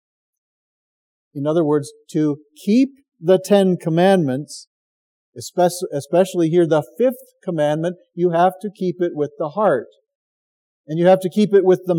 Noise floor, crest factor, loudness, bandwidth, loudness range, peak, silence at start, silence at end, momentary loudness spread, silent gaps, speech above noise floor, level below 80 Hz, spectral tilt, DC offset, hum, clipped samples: under -90 dBFS; 18 dB; -18 LUFS; 17 kHz; 3 LU; -2 dBFS; 1.35 s; 0 s; 11 LU; 4.67-5.33 s, 10.15-10.84 s; over 72 dB; -82 dBFS; -6.5 dB/octave; under 0.1%; none; under 0.1%